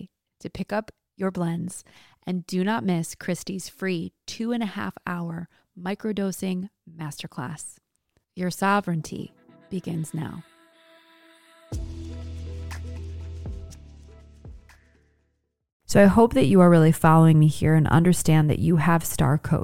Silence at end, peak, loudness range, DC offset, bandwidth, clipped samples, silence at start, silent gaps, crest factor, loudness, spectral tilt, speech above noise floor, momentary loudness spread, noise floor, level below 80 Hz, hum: 0 s; -4 dBFS; 20 LU; under 0.1%; 16 kHz; under 0.1%; 0 s; 15.72-15.80 s; 20 dB; -22 LUFS; -6.5 dB/octave; 51 dB; 21 LU; -73 dBFS; -44 dBFS; none